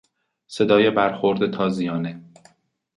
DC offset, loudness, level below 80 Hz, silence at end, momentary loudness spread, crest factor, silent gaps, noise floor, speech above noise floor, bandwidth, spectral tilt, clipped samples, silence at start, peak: under 0.1%; -21 LUFS; -62 dBFS; 0.75 s; 16 LU; 18 dB; none; -57 dBFS; 37 dB; 11 kHz; -6.5 dB/octave; under 0.1%; 0.5 s; -4 dBFS